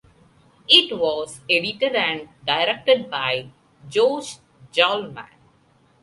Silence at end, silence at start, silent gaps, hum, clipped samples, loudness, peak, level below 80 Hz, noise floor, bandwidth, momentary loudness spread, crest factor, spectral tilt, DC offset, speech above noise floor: 0.8 s; 0.7 s; none; none; under 0.1%; -20 LUFS; 0 dBFS; -64 dBFS; -58 dBFS; 11.5 kHz; 15 LU; 22 dB; -3 dB/octave; under 0.1%; 37 dB